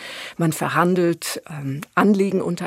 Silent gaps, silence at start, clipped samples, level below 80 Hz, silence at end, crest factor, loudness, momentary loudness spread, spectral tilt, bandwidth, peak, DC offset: none; 0 s; under 0.1%; -64 dBFS; 0 s; 18 dB; -21 LUFS; 12 LU; -5.5 dB/octave; 16 kHz; -2 dBFS; under 0.1%